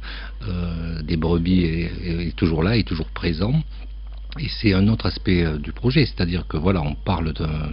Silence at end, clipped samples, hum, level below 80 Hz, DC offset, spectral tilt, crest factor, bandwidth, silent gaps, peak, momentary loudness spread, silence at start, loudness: 0 s; under 0.1%; none; -30 dBFS; under 0.1%; -6 dB/octave; 18 dB; 5.6 kHz; none; -2 dBFS; 11 LU; 0 s; -22 LUFS